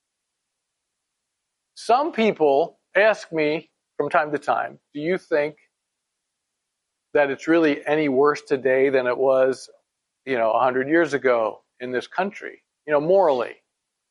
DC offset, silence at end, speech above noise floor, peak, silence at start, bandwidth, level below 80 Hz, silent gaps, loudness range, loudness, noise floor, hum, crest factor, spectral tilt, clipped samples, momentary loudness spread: under 0.1%; 0.55 s; 60 dB; -4 dBFS; 1.75 s; 11.5 kHz; -76 dBFS; none; 5 LU; -21 LUFS; -80 dBFS; none; 18 dB; -5.5 dB/octave; under 0.1%; 11 LU